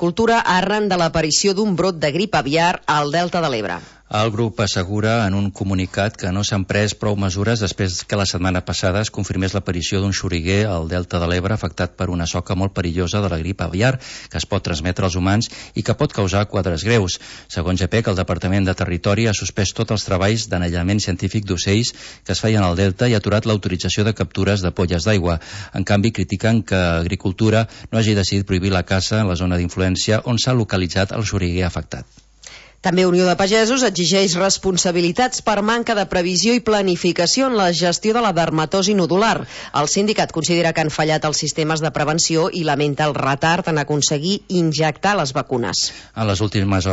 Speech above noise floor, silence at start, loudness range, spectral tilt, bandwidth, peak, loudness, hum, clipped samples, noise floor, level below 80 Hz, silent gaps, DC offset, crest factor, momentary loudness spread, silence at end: 23 dB; 0 s; 4 LU; -4.5 dB/octave; 8 kHz; -4 dBFS; -18 LUFS; none; under 0.1%; -42 dBFS; -40 dBFS; none; under 0.1%; 16 dB; 6 LU; 0 s